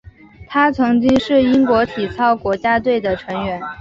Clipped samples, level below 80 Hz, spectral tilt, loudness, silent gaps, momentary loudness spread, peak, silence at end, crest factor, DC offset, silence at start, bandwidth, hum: under 0.1%; -44 dBFS; -6.5 dB/octave; -16 LUFS; none; 8 LU; -2 dBFS; 0 s; 14 dB; under 0.1%; 0.05 s; 7.4 kHz; none